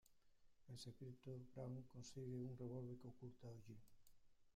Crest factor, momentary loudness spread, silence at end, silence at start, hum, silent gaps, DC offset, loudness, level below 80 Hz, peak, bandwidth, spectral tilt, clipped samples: 14 dB; 10 LU; 0 s; 0.05 s; none; none; under 0.1%; -56 LUFS; -78 dBFS; -42 dBFS; 15 kHz; -7 dB/octave; under 0.1%